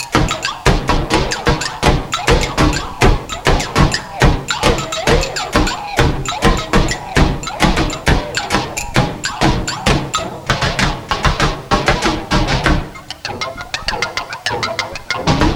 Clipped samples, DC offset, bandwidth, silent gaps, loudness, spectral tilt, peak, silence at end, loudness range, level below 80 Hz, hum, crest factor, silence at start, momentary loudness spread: under 0.1%; under 0.1%; 16.5 kHz; none; -16 LUFS; -4.5 dB/octave; 0 dBFS; 0 s; 2 LU; -22 dBFS; none; 16 dB; 0 s; 6 LU